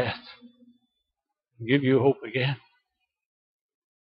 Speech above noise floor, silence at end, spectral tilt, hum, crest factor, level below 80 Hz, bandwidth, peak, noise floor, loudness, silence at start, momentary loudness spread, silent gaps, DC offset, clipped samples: 61 dB; 1.45 s; -10.5 dB/octave; none; 22 dB; -70 dBFS; 5.4 kHz; -8 dBFS; -85 dBFS; -25 LUFS; 0 s; 17 LU; none; under 0.1%; under 0.1%